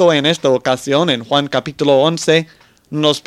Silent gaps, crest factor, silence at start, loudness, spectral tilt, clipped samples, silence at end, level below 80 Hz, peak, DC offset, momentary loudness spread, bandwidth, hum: none; 14 dB; 0 s; -15 LUFS; -4.5 dB/octave; under 0.1%; 0.05 s; -56 dBFS; 0 dBFS; under 0.1%; 5 LU; 14 kHz; none